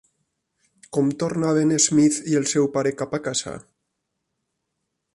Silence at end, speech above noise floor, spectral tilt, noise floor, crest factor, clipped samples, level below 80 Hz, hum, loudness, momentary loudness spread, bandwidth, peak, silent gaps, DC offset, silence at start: 1.55 s; 57 dB; -4.5 dB/octave; -78 dBFS; 20 dB; under 0.1%; -62 dBFS; none; -21 LUFS; 10 LU; 11.5 kHz; -4 dBFS; none; under 0.1%; 0.9 s